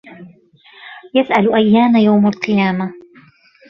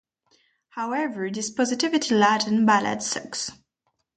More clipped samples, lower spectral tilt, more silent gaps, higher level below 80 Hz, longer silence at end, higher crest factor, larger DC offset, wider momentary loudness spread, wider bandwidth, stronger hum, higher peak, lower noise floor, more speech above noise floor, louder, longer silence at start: neither; first, -8 dB/octave vs -3.5 dB/octave; neither; first, -58 dBFS vs -68 dBFS; about the same, 0.7 s vs 0.65 s; second, 14 dB vs 20 dB; neither; about the same, 14 LU vs 12 LU; second, 6.4 kHz vs 9.4 kHz; neither; first, 0 dBFS vs -6 dBFS; second, -48 dBFS vs -75 dBFS; second, 34 dB vs 52 dB; first, -14 LUFS vs -23 LUFS; second, 0.1 s vs 0.75 s